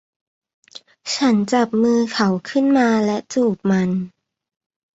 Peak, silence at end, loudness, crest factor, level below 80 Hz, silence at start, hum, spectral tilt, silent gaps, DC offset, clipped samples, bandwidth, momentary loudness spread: -4 dBFS; 0.85 s; -18 LUFS; 16 dB; -62 dBFS; 1.05 s; none; -5.5 dB/octave; none; under 0.1%; under 0.1%; 8 kHz; 9 LU